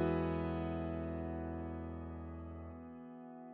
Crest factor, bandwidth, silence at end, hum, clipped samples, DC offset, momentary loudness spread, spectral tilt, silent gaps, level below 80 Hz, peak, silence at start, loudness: 16 dB; 4.6 kHz; 0 s; none; under 0.1%; under 0.1%; 14 LU; -8 dB/octave; none; -52 dBFS; -24 dBFS; 0 s; -42 LUFS